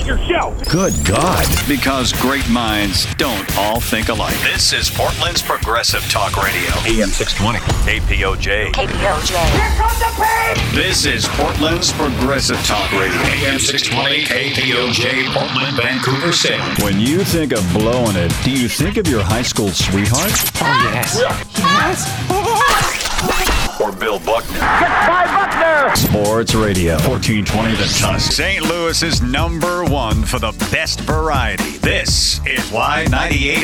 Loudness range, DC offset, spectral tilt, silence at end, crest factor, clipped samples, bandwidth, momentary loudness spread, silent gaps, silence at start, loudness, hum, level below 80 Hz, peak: 2 LU; under 0.1%; -3.5 dB/octave; 0 s; 14 dB; under 0.1%; over 20 kHz; 4 LU; none; 0 s; -15 LUFS; none; -26 dBFS; -2 dBFS